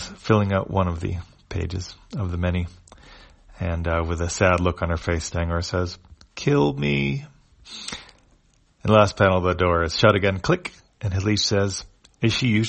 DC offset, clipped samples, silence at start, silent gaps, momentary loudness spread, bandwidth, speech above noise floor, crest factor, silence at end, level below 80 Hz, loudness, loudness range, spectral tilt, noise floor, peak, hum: under 0.1%; under 0.1%; 0 s; none; 15 LU; 8.8 kHz; 38 dB; 22 dB; 0 s; -40 dBFS; -23 LUFS; 7 LU; -5.5 dB/octave; -60 dBFS; -2 dBFS; none